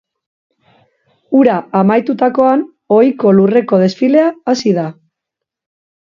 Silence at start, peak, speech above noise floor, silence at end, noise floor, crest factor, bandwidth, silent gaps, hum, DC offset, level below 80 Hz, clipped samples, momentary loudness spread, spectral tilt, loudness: 1.3 s; 0 dBFS; 69 dB; 1.1 s; -80 dBFS; 14 dB; 7.4 kHz; none; none; under 0.1%; -58 dBFS; under 0.1%; 6 LU; -7.5 dB/octave; -12 LUFS